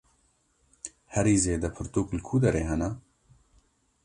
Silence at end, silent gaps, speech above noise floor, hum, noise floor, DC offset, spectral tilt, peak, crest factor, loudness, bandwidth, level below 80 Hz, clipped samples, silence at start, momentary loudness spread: 1.05 s; none; 42 dB; none; -69 dBFS; under 0.1%; -6 dB/octave; -10 dBFS; 20 dB; -27 LUFS; 11.5 kHz; -44 dBFS; under 0.1%; 0.85 s; 19 LU